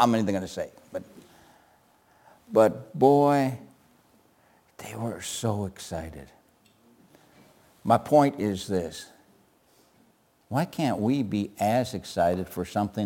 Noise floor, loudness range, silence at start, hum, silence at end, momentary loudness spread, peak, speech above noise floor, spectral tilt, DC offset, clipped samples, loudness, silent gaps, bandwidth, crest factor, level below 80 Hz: -63 dBFS; 10 LU; 0 s; none; 0 s; 18 LU; -6 dBFS; 38 dB; -6 dB/octave; under 0.1%; under 0.1%; -26 LUFS; none; 17 kHz; 22 dB; -60 dBFS